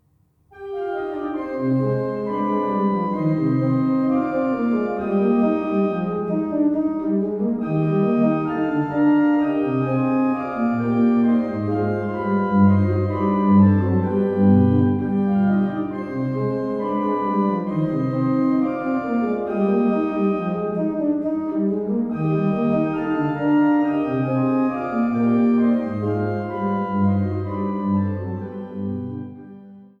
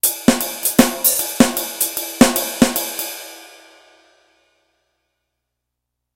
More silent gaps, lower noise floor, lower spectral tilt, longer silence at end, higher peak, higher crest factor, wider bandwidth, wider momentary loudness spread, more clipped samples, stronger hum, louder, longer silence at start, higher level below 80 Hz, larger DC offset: neither; second, -61 dBFS vs -79 dBFS; first, -11 dB/octave vs -3 dB/octave; second, 0.15 s vs 2.65 s; second, -6 dBFS vs 0 dBFS; second, 14 dB vs 20 dB; second, 5 kHz vs 17.5 kHz; second, 8 LU vs 12 LU; second, under 0.1% vs 0.1%; second, none vs 60 Hz at -40 dBFS; second, -21 LUFS vs -16 LUFS; first, 0.55 s vs 0.05 s; second, -56 dBFS vs -44 dBFS; neither